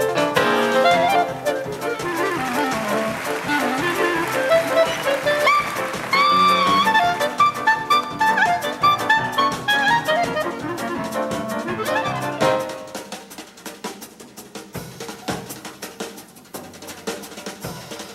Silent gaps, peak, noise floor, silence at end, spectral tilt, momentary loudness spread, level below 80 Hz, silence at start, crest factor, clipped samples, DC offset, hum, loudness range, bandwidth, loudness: none; -2 dBFS; -41 dBFS; 0 s; -3.5 dB/octave; 18 LU; -56 dBFS; 0 s; 18 dB; under 0.1%; under 0.1%; none; 15 LU; 16 kHz; -19 LUFS